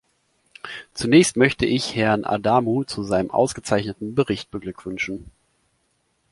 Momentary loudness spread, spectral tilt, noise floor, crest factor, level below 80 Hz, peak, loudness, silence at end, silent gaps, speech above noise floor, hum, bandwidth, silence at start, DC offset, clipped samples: 16 LU; -5 dB/octave; -69 dBFS; 20 dB; -50 dBFS; -2 dBFS; -21 LUFS; 1.05 s; none; 48 dB; none; 11.5 kHz; 0.65 s; under 0.1%; under 0.1%